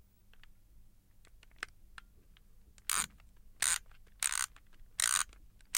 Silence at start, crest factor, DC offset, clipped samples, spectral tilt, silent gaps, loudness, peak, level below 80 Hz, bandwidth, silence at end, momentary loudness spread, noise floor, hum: 0.3 s; 30 dB; under 0.1%; under 0.1%; 2 dB/octave; none; -34 LUFS; -10 dBFS; -60 dBFS; 17 kHz; 0 s; 17 LU; -60 dBFS; none